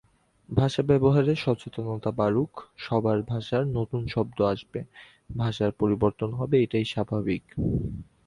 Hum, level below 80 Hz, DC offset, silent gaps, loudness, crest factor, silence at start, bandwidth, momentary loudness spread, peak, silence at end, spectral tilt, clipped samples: none; -48 dBFS; under 0.1%; none; -26 LUFS; 18 dB; 0.5 s; 11 kHz; 10 LU; -8 dBFS; 0.25 s; -8 dB/octave; under 0.1%